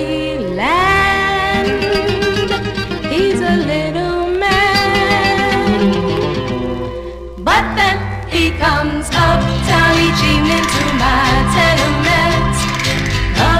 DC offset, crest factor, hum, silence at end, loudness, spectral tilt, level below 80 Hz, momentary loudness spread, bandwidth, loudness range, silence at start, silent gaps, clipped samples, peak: 0.1%; 12 dB; none; 0 s; -14 LUFS; -5 dB/octave; -26 dBFS; 7 LU; 16 kHz; 3 LU; 0 s; none; under 0.1%; -2 dBFS